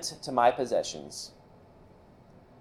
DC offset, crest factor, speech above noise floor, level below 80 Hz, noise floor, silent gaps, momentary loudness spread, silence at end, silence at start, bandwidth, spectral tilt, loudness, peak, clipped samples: under 0.1%; 22 dB; 26 dB; -64 dBFS; -55 dBFS; none; 16 LU; 1.3 s; 0 s; 15 kHz; -3 dB/octave; -29 LUFS; -10 dBFS; under 0.1%